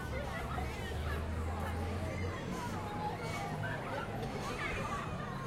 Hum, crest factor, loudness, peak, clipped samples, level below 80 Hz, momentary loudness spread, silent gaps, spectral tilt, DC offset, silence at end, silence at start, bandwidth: none; 14 dB; -39 LUFS; -26 dBFS; under 0.1%; -48 dBFS; 2 LU; none; -6 dB/octave; under 0.1%; 0 s; 0 s; 16 kHz